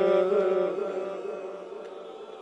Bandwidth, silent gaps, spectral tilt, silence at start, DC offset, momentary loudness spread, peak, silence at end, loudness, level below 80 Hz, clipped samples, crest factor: 8.4 kHz; none; -7 dB/octave; 0 s; under 0.1%; 18 LU; -12 dBFS; 0 s; -28 LUFS; -84 dBFS; under 0.1%; 16 dB